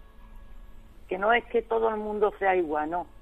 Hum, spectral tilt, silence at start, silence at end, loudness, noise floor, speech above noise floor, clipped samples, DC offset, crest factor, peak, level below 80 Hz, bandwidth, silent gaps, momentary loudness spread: none; -6.5 dB/octave; 0 s; 0.15 s; -27 LUFS; -46 dBFS; 20 dB; under 0.1%; under 0.1%; 18 dB; -10 dBFS; -50 dBFS; 4 kHz; none; 5 LU